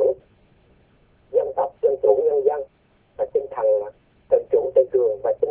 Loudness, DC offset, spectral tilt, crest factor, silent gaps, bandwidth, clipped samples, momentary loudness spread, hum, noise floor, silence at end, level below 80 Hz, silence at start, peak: -21 LUFS; under 0.1%; -10.5 dB/octave; 18 dB; none; 3.3 kHz; under 0.1%; 11 LU; none; -59 dBFS; 0 s; -60 dBFS; 0 s; -4 dBFS